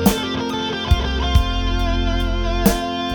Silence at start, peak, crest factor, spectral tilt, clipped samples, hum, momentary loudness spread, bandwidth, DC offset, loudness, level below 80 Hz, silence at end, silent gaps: 0 s; -2 dBFS; 16 dB; -5 dB/octave; under 0.1%; none; 4 LU; over 20 kHz; under 0.1%; -20 LUFS; -22 dBFS; 0 s; none